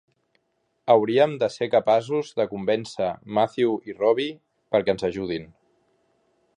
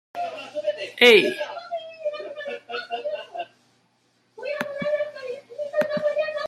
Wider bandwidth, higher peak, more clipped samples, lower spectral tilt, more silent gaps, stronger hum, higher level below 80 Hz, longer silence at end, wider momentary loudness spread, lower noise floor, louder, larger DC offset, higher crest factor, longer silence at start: second, 10.5 kHz vs 15 kHz; second, -4 dBFS vs 0 dBFS; neither; first, -6 dB/octave vs -3 dB/octave; neither; neither; first, -62 dBFS vs -74 dBFS; first, 1.15 s vs 0 s; second, 9 LU vs 19 LU; first, -72 dBFS vs -66 dBFS; about the same, -23 LUFS vs -24 LUFS; neither; about the same, 20 dB vs 24 dB; first, 0.85 s vs 0.15 s